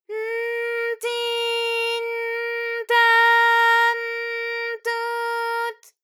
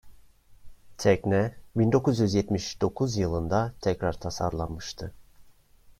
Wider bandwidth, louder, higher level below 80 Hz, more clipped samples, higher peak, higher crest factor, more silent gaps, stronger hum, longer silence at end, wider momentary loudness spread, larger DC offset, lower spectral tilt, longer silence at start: first, 19 kHz vs 15 kHz; first, -21 LUFS vs -27 LUFS; second, under -90 dBFS vs -48 dBFS; neither; about the same, -6 dBFS vs -8 dBFS; about the same, 16 dB vs 20 dB; neither; neither; first, 0.3 s vs 0.1 s; about the same, 11 LU vs 11 LU; neither; second, 4 dB/octave vs -6.5 dB/octave; about the same, 0.1 s vs 0.05 s